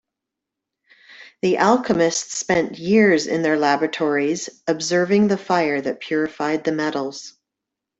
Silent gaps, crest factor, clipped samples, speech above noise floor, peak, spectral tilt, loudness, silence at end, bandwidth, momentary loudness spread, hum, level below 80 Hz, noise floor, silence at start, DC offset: none; 18 dB; under 0.1%; 64 dB; -4 dBFS; -4.5 dB/octave; -20 LUFS; 0.7 s; 8.4 kHz; 8 LU; none; -62 dBFS; -84 dBFS; 1.1 s; under 0.1%